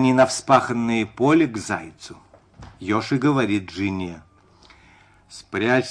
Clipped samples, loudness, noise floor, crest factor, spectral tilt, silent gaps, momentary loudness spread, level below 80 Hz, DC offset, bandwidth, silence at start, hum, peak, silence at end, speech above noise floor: under 0.1%; -21 LUFS; -53 dBFS; 18 dB; -5.5 dB/octave; none; 20 LU; -56 dBFS; under 0.1%; 10.5 kHz; 0 s; none; -4 dBFS; 0 s; 32 dB